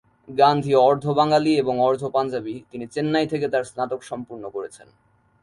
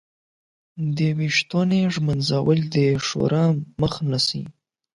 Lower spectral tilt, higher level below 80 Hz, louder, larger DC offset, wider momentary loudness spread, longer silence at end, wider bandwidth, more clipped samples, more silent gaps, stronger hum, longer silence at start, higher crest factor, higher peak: about the same, -6.5 dB/octave vs -6 dB/octave; second, -62 dBFS vs -52 dBFS; about the same, -21 LUFS vs -21 LUFS; neither; first, 16 LU vs 6 LU; first, 0.65 s vs 0.45 s; about the same, 11.5 kHz vs 11.5 kHz; neither; neither; neither; second, 0.3 s vs 0.75 s; about the same, 18 dB vs 16 dB; about the same, -4 dBFS vs -6 dBFS